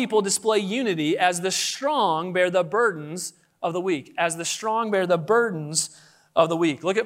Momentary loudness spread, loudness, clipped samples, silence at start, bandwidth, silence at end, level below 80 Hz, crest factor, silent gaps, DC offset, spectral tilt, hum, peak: 7 LU; -23 LUFS; under 0.1%; 0 s; 16 kHz; 0 s; -76 dBFS; 18 dB; none; under 0.1%; -3.5 dB/octave; none; -6 dBFS